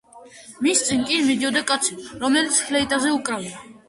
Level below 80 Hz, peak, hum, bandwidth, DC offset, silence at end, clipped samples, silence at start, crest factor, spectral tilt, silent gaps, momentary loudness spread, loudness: -56 dBFS; -6 dBFS; none; 11.5 kHz; under 0.1%; 0.15 s; under 0.1%; 0.15 s; 18 dB; -1.5 dB/octave; none; 8 LU; -20 LUFS